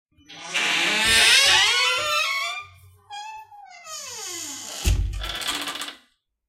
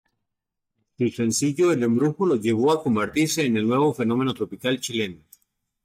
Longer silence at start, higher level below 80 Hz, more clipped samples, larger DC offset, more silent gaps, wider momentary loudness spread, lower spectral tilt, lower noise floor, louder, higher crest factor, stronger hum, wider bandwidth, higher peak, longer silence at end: second, 0.3 s vs 1 s; first, -36 dBFS vs -64 dBFS; neither; neither; neither; first, 23 LU vs 6 LU; second, -0.5 dB/octave vs -5 dB/octave; second, -63 dBFS vs -82 dBFS; first, -19 LUFS vs -23 LUFS; first, 20 dB vs 12 dB; neither; about the same, 16.5 kHz vs 16 kHz; first, -4 dBFS vs -12 dBFS; second, 0.55 s vs 0.7 s